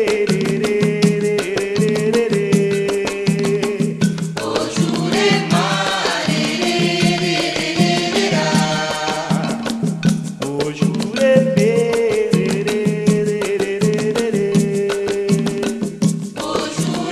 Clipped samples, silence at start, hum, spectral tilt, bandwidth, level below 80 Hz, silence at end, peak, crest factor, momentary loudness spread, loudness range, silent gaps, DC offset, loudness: under 0.1%; 0 s; none; -5 dB/octave; 14 kHz; -50 dBFS; 0 s; 0 dBFS; 16 dB; 5 LU; 2 LU; none; under 0.1%; -17 LUFS